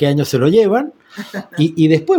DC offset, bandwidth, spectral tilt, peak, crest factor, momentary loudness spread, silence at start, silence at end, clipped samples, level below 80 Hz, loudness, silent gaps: under 0.1%; 17.5 kHz; -7 dB/octave; 0 dBFS; 14 dB; 16 LU; 0 s; 0 s; under 0.1%; -56 dBFS; -14 LUFS; none